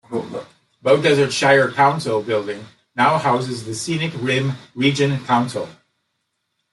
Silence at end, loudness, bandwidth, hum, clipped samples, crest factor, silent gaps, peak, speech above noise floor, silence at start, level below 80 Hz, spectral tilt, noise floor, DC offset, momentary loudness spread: 1 s; -18 LUFS; 12 kHz; none; under 0.1%; 18 dB; none; -2 dBFS; 55 dB; 0.1 s; -62 dBFS; -5 dB/octave; -73 dBFS; under 0.1%; 15 LU